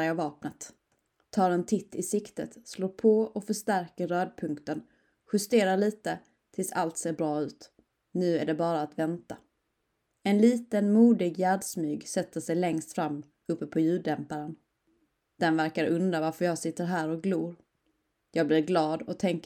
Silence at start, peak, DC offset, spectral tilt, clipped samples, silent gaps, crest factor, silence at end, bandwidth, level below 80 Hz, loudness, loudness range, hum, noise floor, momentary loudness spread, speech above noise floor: 0 s; -10 dBFS; under 0.1%; -5.5 dB/octave; under 0.1%; none; 18 dB; 0.05 s; 17.5 kHz; -74 dBFS; -29 LUFS; 5 LU; none; -78 dBFS; 14 LU; 50 dB